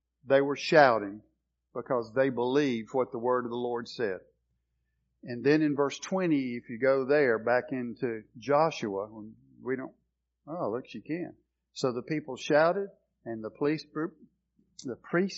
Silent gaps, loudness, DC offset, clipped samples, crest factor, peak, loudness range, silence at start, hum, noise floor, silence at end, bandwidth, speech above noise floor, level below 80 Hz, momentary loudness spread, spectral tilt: none; -29 LUFS; under 0.1%; under 0.1%; 24 dB; -6 dBFS; 6 LU; 0.25 s; none; -78 dBFS; 0 s; 7.4 kHz; 49 dB; -74 dBFS; 17 LU; -4.5 dB/octave